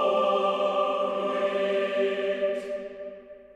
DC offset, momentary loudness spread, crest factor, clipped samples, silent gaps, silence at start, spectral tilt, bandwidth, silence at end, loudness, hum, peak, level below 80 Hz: under 0.1%; 15 LU; 14 dB; under 0.1%; none; 0 s; -5 dB/octave; 9.4 kHz; 0.1 s; -27 LUFS; none; -14 dBFS; -68 dBFS